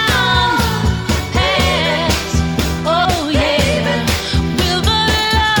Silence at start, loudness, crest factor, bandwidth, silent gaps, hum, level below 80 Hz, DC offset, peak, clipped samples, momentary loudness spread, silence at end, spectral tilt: 0 s; -14 LUFS; 14 dB; over 20 kHz; none; none; -24 dBFS; under 0.1%; -2 dBFS; under 0.1%; 4 LU; 0 s; -4 dB/octave